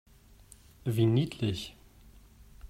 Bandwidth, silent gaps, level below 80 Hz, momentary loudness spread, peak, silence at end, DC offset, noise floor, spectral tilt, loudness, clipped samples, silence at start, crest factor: 15.5 kHz; none; -56 dBFS; 13 LU; -14 dBFS; 0.05 s; under 0.1%; -56 dBFS; -7 dB/octave; -30 LUFS; under 0.1%; 0.85 s; 18 dB